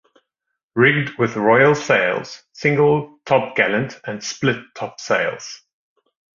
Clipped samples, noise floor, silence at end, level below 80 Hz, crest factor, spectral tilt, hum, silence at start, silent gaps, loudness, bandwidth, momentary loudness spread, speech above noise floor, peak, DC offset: under 0.1%; -79 dBFS; 0.85 s; -58 dBFS; 18 dB; -5.5 dB/octave; none; 0.75 s; none; -18 LUFS; 7.4 kHz; 15 LU; 61 dB; -2 dBFS; under 0.1%